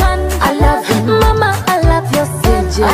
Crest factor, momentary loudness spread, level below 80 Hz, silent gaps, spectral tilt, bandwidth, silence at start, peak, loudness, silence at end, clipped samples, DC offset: 10 dB; 3 LU; -18 dBFS; none; -5.5 dB/octave; 16 kHz; 0 s; 0 dBFS; -13 LUFS; 0 s; under 0.1%; under 0.1%